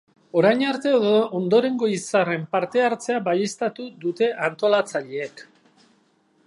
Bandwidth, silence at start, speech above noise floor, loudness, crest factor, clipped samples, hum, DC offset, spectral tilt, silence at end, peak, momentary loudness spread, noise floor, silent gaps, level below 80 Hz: 11.5 kHz; 0.35 s; 41 dB; -22 LUFS; 18 dB; under 0.1%; none; under 0.1%; -5 dB/octave; 1.05 s; -4 dBFS; 9 LU; -62 dBFS; none; -76 dBFS